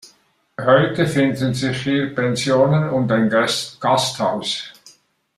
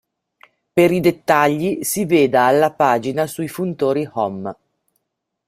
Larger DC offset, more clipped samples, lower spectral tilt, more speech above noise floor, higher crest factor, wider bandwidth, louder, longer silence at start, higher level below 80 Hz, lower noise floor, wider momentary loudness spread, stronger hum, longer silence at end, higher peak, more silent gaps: neither; neither; about the same, -5 dB/octave vs -5.5 dB/octave; second, 40 dB vs 60 dB; about the same, 16 dB vs 18 dB; second, 13.5 kHz vs 16 kHz; about the same, -18 LUFS vs -17 LUFS; second, 0.05 s vs 0.75 s; about the same, -56 dBFS vs -58 dBFS; second, -58 dBFS vs -77 dBFS; about the same, 8 LU vs 10 LU; neither; second, 0.65 s vs 0.95 s; about the same, -2 dBFS vs 0 dBFS; neither